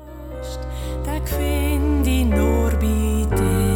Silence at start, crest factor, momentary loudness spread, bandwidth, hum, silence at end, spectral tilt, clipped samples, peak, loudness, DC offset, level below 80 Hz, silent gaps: 0 s; 14 dB; 12 LU; 17.5 kHz; none; 0 s; -6.5 dB/octave; under 0.1%; -6 dBFS; -21 LUFS; under 0.1%; -22 dBFS; none